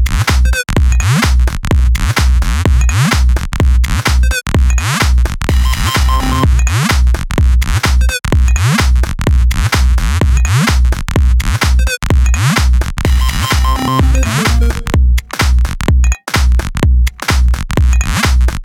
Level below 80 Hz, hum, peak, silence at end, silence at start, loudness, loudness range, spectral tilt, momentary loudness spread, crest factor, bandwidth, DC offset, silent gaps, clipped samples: -12 dBFS; none; -2 dBFS; 0 s; 0 s; -13 LUFS; 1 LU; -4.5 dB/octave; 3 LU; 8 dB; 16 kHz; under 0.1%; none; under 0.1%